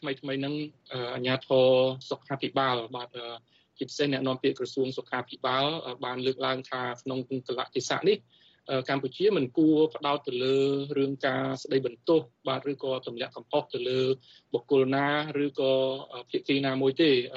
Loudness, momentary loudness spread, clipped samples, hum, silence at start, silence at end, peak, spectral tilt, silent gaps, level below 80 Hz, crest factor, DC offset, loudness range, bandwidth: -28 LUFS; 11 LU; under 0.1%; none; 0 s; 0 s; -12 dBFS; -5.5 dB/octave; none; -74 dBFS; 16 dB; under 0.1%; 4 LU; 8 kHz